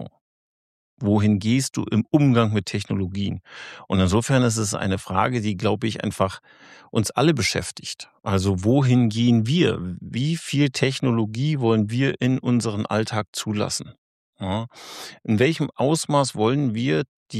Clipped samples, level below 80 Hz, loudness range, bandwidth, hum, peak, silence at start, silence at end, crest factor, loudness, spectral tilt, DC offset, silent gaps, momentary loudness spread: under 0.1%; -54 dBFS; 4 LU; 14 kHz; none; -4 dBFS; 0 s; 0 s; 18 dB; -22 LUFS; -5.5 dB/octave; under 0.1%; 0.21-0.97 s, 13.28-13.33 s, 13.98-14.33 s, 17.08-17.26 s; 11 LU